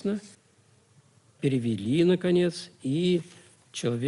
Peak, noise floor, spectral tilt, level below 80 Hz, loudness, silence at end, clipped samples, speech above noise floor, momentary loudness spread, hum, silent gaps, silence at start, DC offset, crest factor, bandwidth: -12 dBFS; -62 dBFS; -6.5 dB/octave; -66 dBFS; -27 LUFS; 0 s; under 0.1%; 36 dB; 12 LU; none; none; 0.05 s; under 0.1%; 16 dB; 11.5 kHz